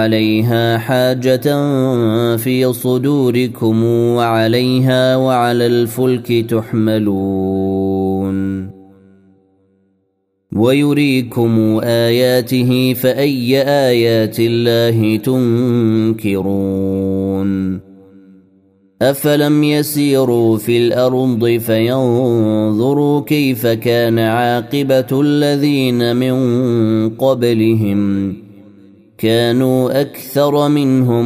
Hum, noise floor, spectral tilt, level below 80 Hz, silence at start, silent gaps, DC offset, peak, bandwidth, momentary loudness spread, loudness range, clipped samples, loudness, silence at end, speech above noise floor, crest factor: none; -65 dBFS; -6.5 dB/octave; -56 dBFS; 0 s; none; under 0.1%; 0 dBFS; 16 kHz; 5 LU; 4 LU; under 0.1%; -14 LUFS; 0 s; 52 dB; 14 dB